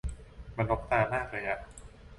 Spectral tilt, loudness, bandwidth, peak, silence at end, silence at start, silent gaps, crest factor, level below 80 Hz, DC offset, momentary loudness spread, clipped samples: -6.5 dB/octave; -31 LUFS; 11.5 kHz; -12 dBFS; 0 s; 0.05 s; none; 22 dB; -44 dBFS; under 0.1%; 21 LU; under 0.1%